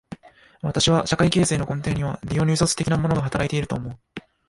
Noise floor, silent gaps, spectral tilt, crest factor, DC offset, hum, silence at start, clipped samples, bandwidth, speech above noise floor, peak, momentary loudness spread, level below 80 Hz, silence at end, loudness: -47 dBFS; none; -5 dB/octave; 20 dB; under 0.1%; none; 0.1 s; under 0.1%; 11.5 kHz; 25 dB; -2 dBFS; 17 LU; -42 dBFS; 0.3 s; -22 LUFS